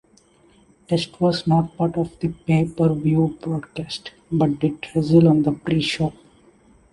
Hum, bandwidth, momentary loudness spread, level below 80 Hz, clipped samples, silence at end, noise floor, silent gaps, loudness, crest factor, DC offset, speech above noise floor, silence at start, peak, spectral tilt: none; 11.5 kHz; 11 LU; -50 dBFS; under 0.1%; 0.8 s; -55 dBFS; none; -21 LUFS; 18 dB; under 0.1%; 36 dB; 0.9 s; -4 dBFS; -7.5 dB/octave